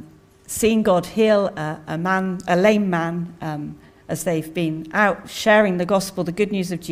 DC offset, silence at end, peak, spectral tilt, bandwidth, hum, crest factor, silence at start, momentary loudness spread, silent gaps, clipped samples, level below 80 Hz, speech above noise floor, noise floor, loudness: under 0.1%; 0 s; -2 dBFS; -5.5 dB/octave; 16 kHz; none; 18 dB; 0 s; 12 LU; none; under 0.1%; -52 dBFS; 25 dB; -45 dBFS; -20 LUFS